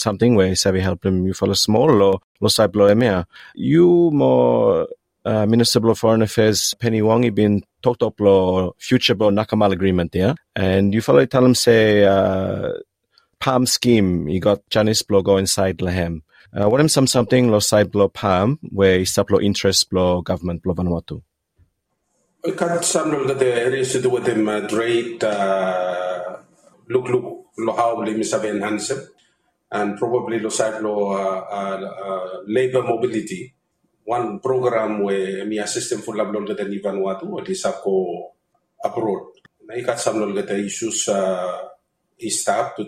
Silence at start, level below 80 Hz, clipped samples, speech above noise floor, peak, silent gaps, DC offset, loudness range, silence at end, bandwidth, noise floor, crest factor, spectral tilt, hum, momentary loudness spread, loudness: 0 s; -52 dBFS; under 0.1%; 52 dB; 0 dBFS; 2.24-2.35 s; under 0.1%; 7 LU; 0 s; 16 kHz; -71 dBFS; 18 dB; -5 dB/octave; none; 12 LU; -19 LUFS